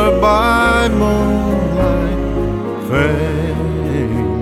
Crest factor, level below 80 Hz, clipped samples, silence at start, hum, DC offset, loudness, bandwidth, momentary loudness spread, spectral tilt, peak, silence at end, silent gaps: 12 dB; -24 dBFS; under 0.1%; 0 s; none; under 0.1%; -15 LUFS; 15.5 kHz; 7 LU; -7 dB/octave; -2 dBFS; 0 s; none